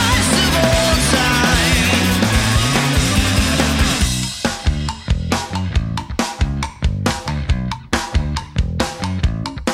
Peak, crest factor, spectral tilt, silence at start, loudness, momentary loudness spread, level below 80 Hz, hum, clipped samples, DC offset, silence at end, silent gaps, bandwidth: -2 dBFS; 14 dB; -4 dB/octave; 0 s; -17 LUFS; 8 LU; -24 dBFS; none; under 0.1%; under 0.1%; 0 s; none; 16.5 kHz